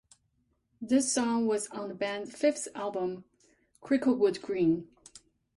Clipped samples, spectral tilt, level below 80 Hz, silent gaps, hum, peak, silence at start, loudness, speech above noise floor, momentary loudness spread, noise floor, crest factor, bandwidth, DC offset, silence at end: under 0.1%; -4 dB/octave; -70 dBFS; none; none; -14 dBFS; 0.8 s; -30 LUFS; 45 dB; 10 LU; -75 dBFS; 16 dB; 11.5 kHz; under 0.1%; 0.4 s